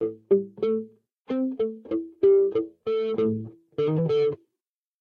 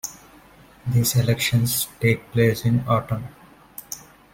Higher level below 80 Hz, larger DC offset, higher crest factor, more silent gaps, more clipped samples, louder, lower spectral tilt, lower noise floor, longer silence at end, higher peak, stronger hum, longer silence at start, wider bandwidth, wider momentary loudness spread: second, -68 dBFS vs -50 dBFS; neither; about the same, 16 dB vs 18 dB; first, 1.13-1.25 s vs none; neither; second, -25 LUFS vs -21 LUFS; first, -10 dB/octave vs -5 dB/octave; first, -87 dBFS vs -49 dBFS; first, 0.65 s vs 0.35 s; second, -10 dBFS vs -4 dBFS; neither; about the same, 0 s vs 0.05 s; second, 5.2 kHz vs 17 kHz; second, 11 LU vs 17 LU